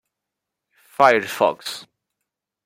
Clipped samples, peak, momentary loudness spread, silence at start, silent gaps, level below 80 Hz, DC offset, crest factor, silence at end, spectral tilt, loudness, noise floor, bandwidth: under 0.1%; -2 dBFS; 19 LU; 1 s; none; -72 dBFS; under 0.1%; 22 dB; 0.85 s; -3.5 dB/octave; -18 LUFS; -83 dBFS; 16.5 kHz